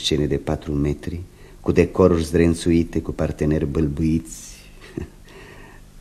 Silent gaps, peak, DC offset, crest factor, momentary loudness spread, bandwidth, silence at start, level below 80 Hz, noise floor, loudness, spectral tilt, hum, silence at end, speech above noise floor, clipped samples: none; 0 dBFS; under 0.1%; 22 dB; 19 LU; 14 kHz; 0 s; -34 dBFS; -42 dBFS; -21 LUFS; -6.5 dB/octave; none; 0 s; 22 dB; under 0.1%